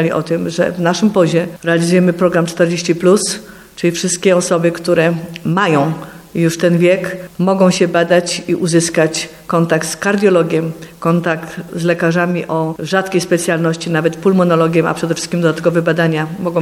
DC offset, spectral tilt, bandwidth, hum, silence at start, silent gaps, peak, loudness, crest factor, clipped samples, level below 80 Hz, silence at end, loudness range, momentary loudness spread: under 0.1%; -5.5 dB/octave; 15 kHz; none; 0 s; none; 0 dBFS; -14 LUFS; 14 dB; under 0.1%; -52 dBFS; 0 s; 2 LU; 7 LU